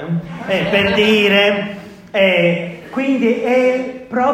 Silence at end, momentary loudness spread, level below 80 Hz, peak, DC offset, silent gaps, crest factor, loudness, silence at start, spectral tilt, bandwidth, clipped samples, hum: 0 s; 11 LU; -50 dBFS; 0 dBFS; under 0.1%; none; 16 dB; -15 LUFS; 0 s; -6 dB/octave; 16 kHz; under 0.1%; none